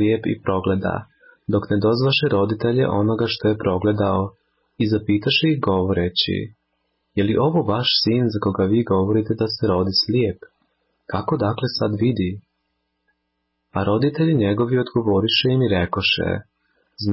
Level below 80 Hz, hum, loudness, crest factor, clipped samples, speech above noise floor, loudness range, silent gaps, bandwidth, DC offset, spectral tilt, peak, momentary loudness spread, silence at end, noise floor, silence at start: -42 dBFS; none; -20 LUFS; 14 dB; under 0.1%; 55 dB; 4 LU; none; 5.8 kHz; under 0.1%; -9.5 dB/octave; -6 dBFS; 9 LU; 0 s; -74 dBFS; 0 s